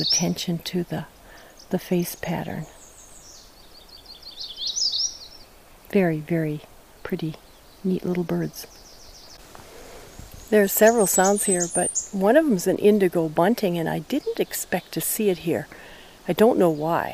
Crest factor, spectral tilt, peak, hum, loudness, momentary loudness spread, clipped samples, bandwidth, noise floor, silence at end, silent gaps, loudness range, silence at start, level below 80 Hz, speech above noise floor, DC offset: 20 dB; -4 dB/octave; -4 dBFS; none; -23 LUFS; 24 LU; under 0.1%; 16 kHz; -48 dBFS; 0 s; none; 11 LU; 0 s; -54 dBFS; 26 dB; under 0.1%